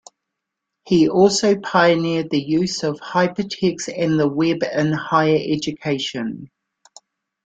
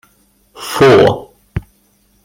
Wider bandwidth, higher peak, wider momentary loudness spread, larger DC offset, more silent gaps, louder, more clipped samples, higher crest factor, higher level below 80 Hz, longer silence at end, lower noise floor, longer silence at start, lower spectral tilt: second, 9.2 kHz vs 16.5 kHz; about the same, -2 dBFS vs 0 dBFS; second, 8 LU vs 19 LU; neither; neither; second, -19 LUFS vs -10 LUFS; neither; about the same, 18 dB vs 14 dB; second, -58 dBFS vs -38 dBFS; first, 1 s vs 0.65 s; first, -81 dBFS vs -55 dBFS; first, 0.85 s vs 0.6 s; about the same, -5 dB/octave vs -5.5 dB/octave